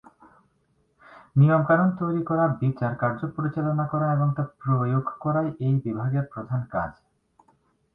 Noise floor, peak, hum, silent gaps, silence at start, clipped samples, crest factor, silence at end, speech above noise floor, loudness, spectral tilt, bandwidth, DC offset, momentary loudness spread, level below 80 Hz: -68 dBFS; -8 dBFS; none; none; 1.1 s; under 0.1%; 16 dB; 1.05 s; 44 dB; -25 LUFS; -12 dB/octave; 3.8 kHz; under 0.1%; 9 LU; -58 dBFS